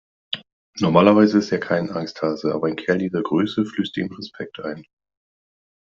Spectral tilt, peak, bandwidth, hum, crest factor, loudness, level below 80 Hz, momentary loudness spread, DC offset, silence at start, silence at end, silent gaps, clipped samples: -7 dB/octave; 0 dBFS; 7.4 kHz; none; 22 dB; -21 LUFS; -62 dBFS; 17 LU; under 0.1%; 0.3 s; 1.1 s; 0.52-0.73 s; under 0.1%